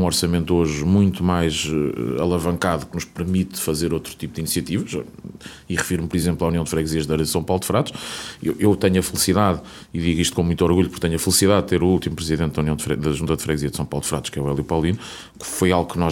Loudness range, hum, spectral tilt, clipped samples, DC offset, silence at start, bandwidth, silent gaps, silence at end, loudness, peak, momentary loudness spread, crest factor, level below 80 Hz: 5 LU; none; -5 dB/octave; under 0.1%; under 0.1%; 0 s; 18 kHz; none; 0 s; -21 LUFS; -2 dBFS; 11 LU; 18 dB; -40 dBFS